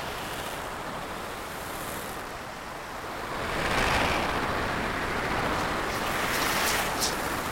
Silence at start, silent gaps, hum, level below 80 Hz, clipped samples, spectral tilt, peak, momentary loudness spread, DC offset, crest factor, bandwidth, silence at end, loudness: 0 s; none; none; -44 dBFS; under 0.1%; -3 dB/octave; -12 dBFS; 11 LU; under 0.1%; 18 dB; 16.5 kHz; 0 s; -29 LUFS